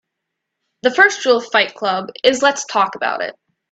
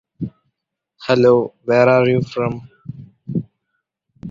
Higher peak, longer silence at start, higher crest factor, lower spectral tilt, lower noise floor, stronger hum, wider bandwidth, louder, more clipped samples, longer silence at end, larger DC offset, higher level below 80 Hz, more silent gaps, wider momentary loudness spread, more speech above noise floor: about the same, 0 dBFS vs -2 dBFS; first, 0.85 s vs 0.2 s; about the same, 18 dB vs 18 dB; second, -1.5 dB/octave vs -8 dB/octave; about the same, -78 dBFS vs -76 dBFS; neither; first, 9 kHz vs 7.4 kHz; about the same, -16 LUFS vs -16 LUFS; neither; first, 0.4 s vs 0 s; neither; second, -66 dBFS vs -54 dBFS; neither; second, 9 LU vs 23 LU; about the same, 62 dB vs 61 dB